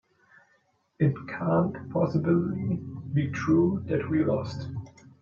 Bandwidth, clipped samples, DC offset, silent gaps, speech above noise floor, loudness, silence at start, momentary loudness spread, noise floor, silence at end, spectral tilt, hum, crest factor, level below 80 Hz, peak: 7.2 kHz; under 0.1%; under 0.1%; none; 42 dB; -27 LUFS; 1 s; 10 LU; -68 dBFS; 0.3 s; -9 dB/octave; none; 16 dB; -64 dBFS; -10 dBFS